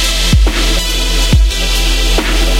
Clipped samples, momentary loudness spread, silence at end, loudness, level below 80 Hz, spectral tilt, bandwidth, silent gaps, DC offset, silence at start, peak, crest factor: under 0.1%; 2 LU; 0 s; -12 LUFS; -12 dBFS; -3.5 dB/octave; 16.5 kHz; none; under 0.1%; 0 s; 0 dBFS; 10 dB